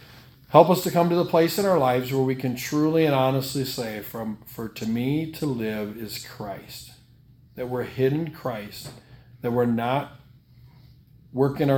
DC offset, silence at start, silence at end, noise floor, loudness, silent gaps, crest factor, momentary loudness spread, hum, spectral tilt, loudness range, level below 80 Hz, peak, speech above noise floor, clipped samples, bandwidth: under 0.1%; 0.1 s; 0 s; -54 dBFS; -24 LUFS; none; 24 dB; 16 LU; none; -6 dB/octave; 9 LU; -58 dBFS; 0 dBFS; 30 dB; under 0.1%; 18 kHz